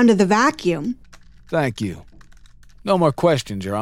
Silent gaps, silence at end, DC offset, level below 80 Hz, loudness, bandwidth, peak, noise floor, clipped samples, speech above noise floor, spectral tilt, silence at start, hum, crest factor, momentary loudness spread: none; 0 s; under 0.1%; -48 dBFS; -20 LUFS; 15.5 kHz; -4 dBFS; -45 dBFS; under 0.1%; 26 dB; -6 dB/octave; 0 s; none; 16 dB; 14 LU